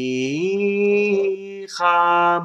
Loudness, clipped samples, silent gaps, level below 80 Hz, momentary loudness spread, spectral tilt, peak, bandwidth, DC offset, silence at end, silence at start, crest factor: -19 LUFS; under 0.1%; none; -78 dBFS; 9 LU; -5.5 dB/octave; -6 dBFS; 9 kHz; under 0.1%; 0 s; 0 s; 14 dB